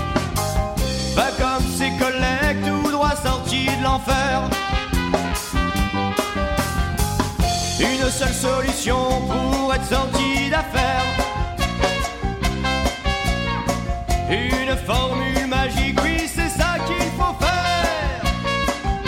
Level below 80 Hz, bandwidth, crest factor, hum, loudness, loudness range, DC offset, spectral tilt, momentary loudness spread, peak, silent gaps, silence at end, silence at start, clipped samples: -28 dBFS; 16.5 kHz; 16 dB; none; -21 LUFS; 2 LU; under 0.1%; -4.5 dB/octave; 3 LU; -4 dBFS; none; 0 s; 0 s; under 0.1%